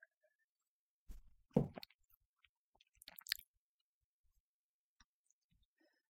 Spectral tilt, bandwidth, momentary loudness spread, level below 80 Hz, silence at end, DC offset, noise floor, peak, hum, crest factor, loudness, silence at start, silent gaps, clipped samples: -5.5 dB/octave; 16 kHz; 24 LU; -68 dBFS; 2.75 s; under 0.1%; under -90 dBFS; -16 dBFS; none; 34 dB; -43 LUFS; 1.1 s; 1.95-1.99 s, 2.25-2.34 s, 2.49-2.73 s; under 0.1%